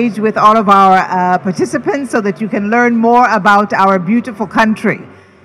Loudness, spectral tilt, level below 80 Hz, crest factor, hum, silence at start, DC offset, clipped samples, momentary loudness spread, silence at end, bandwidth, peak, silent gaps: -11 LUFS; -6 dB/octave; -54 dBFS; 12 dB; none; 0 s; under 0.1%; 1%; 9 LU; 0.35 s; 12.5 kHz; 0 dBFS; none